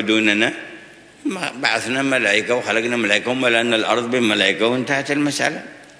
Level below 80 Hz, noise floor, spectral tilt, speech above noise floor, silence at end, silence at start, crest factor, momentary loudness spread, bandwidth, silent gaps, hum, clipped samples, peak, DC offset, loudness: -64 dBFS; -43 dBFS; -3.5 dB/octave; 24 dB; 0.15 s; 0 s; 20 dB; 9 LU; 11 kHz; none; none; under 0.1%; 0 dBFS; under 0.1%; -18 LUFS